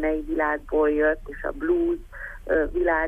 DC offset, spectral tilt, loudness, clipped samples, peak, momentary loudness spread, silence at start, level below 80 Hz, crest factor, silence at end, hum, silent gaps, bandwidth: under 0.1%; -8 dB/octave; -24 LUFS; under 0.1%; -10 dBFS; 11 LU; 0 s; -38 dBFS; 14 dB; 0 s; none; none; 3.6 kHz